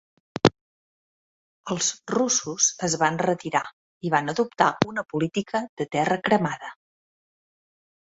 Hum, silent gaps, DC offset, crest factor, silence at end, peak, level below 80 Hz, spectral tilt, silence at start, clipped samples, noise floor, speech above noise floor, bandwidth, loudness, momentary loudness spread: none; 0.61-1.64 s, 3.73-4.01 s, 5.69-5.77 s; under 0.1%; 24 dB; 1.35 s; -2 dBFS; -60 dBFS; -3.5 dB/octave; 0.45 s; under 0.1%; under -90 dBFS; over 66 dB; 8.2 kHz; -24 LUFS; 11 LU